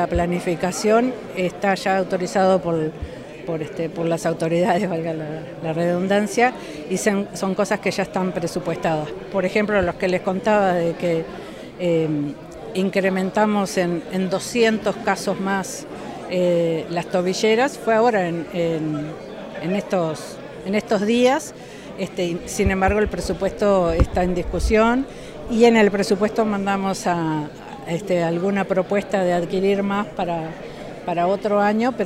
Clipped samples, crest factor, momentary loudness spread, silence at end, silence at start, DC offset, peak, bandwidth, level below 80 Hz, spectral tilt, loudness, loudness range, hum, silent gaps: under 0.1%; 18 dB; 12 LU; 0 s; 0 s; under 0.1%; -2 dBFS; 16 kHz; -38 dBFS; -5.5 dB/octave; -21 LUFS; 3 LU; none; none